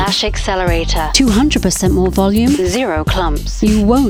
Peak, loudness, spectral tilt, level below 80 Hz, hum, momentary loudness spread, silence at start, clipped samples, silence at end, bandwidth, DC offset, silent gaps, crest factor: 0 dBFS; -14 LUFS; -4.5 dB/octave; -20 dBFS; none; 5 LU; 0 s; under 0.1%; 0 s; over 20 kHz; under 0.1%; none; 12 dB